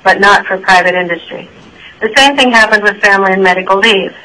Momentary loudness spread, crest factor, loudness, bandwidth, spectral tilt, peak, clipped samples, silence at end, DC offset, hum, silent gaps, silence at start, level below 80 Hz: 12 LU; 10 dB; -8 LUFS; 11 kHz; -3 dB/octave; 0 dBFS; 0.9%; 0.15 s; under 0.1%; none; none; 0.05 s; -44 dBFS